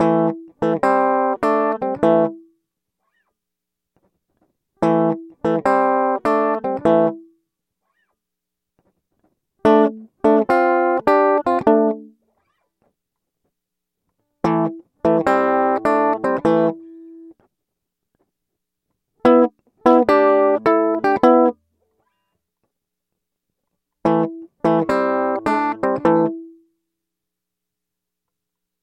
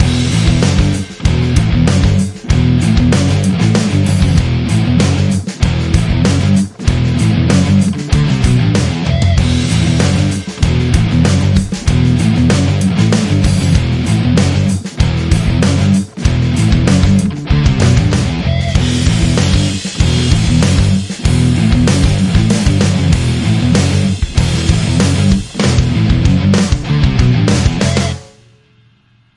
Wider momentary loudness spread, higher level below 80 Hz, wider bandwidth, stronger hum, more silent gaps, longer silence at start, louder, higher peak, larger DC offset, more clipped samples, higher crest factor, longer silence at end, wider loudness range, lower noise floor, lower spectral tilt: first, 8 LU vs 4 LU; second, -58 dBFS vs -22 dBFS; second, 9.2 kHz vs 11.5 kHz; neither; neither; about the same, 0 s vs 0 s; second, -18 LUFS vs -12 LUFS; about the same, 0 dBFS vs 0 dBFS; neither; neither; first, 18 dB vs 12 dB; first, 2.35 s vs 1.15 s; first, 7 LU vs 1 LU; first, -83 dBFS vs -50 dBFS; first, -8 dB/octave vs -6 dB/octave